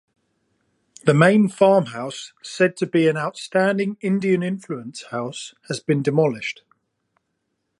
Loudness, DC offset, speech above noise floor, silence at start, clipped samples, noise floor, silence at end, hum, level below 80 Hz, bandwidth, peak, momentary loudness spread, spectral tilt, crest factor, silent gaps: -20 LUFS; under 0.1%; 55 dB; 1.05 s; under 0.1%; -75 dBFS; 1.3 s; none; -68 dBFS; 11.5 kHz; -2 dBFS; 15 LU; -6 dB/octave; 20 dB; none